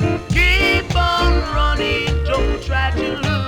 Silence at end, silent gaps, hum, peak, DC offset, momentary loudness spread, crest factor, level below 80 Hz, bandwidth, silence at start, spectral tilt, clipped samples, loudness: 0 s; none; none; -2 dBFS; under 0.1%; 6 LU; 14 dB; -22 dBFS; 15.5 kHz; 0 s; -5.5 dB/octave; under 0.1%; -17 LUFS